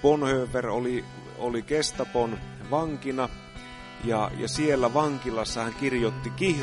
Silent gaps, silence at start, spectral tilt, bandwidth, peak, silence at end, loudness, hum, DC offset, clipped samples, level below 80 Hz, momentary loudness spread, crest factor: none; 0 s; -5 dB/octave; 11.5 kHz; -8 dBFS; 0 s; -28 LUFS; none; under 0.1%; under 0.1%; -48 dBFS; 11 LU; 20 dB